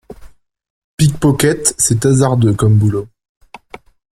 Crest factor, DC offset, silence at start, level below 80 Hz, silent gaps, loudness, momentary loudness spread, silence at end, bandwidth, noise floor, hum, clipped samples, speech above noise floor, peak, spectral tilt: 14 dB; under 0.1%; 0.1 s; -40 dBFS; 0.70-0.98 s; -13 LUFS; 5 LU; 1.1 s; 16 kHz; -39 dBFS; none; under 0.1%; 27 dB; 0 dBFS; -5.5 dB/octave